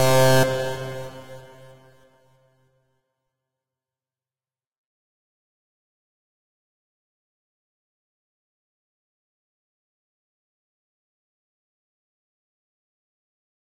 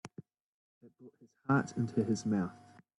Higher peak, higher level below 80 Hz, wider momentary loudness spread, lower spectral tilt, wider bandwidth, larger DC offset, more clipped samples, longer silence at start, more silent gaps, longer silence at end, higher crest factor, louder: first, -6 dBFS vs -18 dBFS; first, -58 dBFS vs -74 dBFS; first, 26 LU vs 18 LU; second, -4.5 dB/octave vs -7 dB/octave; first, 16.5 kHz vs 11.5 kHz; neither; neither; about the same, 0 s vs 0.05 s; second, 4.78-4.85 s vs 0.40-0.81 s; first, 8.85 s vs 0.45 s; first, 24 dB vs 18 dB; first, -20 LUFS vs -34 LUFS